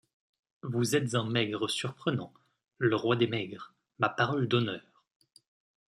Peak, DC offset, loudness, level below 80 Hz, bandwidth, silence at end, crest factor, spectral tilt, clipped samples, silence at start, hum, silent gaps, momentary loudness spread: -12 dBFS; under 0.1%; -30 LUFS; -72 dBFS; 13.5 kHz; 1.1 s; 20 dB; -5 dB/octave; under 0.1%; 0.65 s; none; none; 15 LU